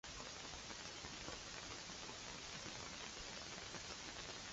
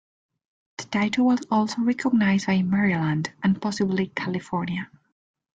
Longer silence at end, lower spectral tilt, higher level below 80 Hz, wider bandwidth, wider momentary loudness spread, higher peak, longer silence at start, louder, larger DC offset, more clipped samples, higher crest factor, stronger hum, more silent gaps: second, 0 s vs 0.75 s; second, -1.5 dB/octave vs -6 dB/octave; about the same, -66 dBFS vs -62 dBFS; about the same, 8 kHz vs 8.6 kHz; second, 1 LU vs 9 LU; second, -32 dBFS vs -10 dBFS; second, 0.05 s vs 0.8 s; second, -49 LUFS vs -24 LUFS; neither; neither; first, 20 dB vs 14 dB; neither; neither